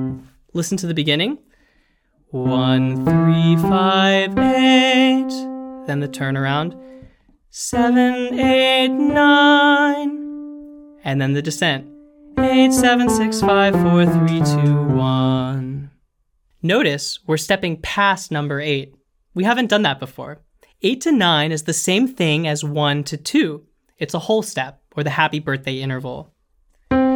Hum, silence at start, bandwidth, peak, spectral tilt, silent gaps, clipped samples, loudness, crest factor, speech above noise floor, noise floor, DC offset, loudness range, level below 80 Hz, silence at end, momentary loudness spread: none; 0 s; 18.5 kHz; -2 dBFS; -5 dB/octave; none; under 0.1%; -17 LUFS; 16 dB; 47 dB; -64 dBFS; under 0.1%; 6 LU; -48 dBFS; 0 s; 15 LU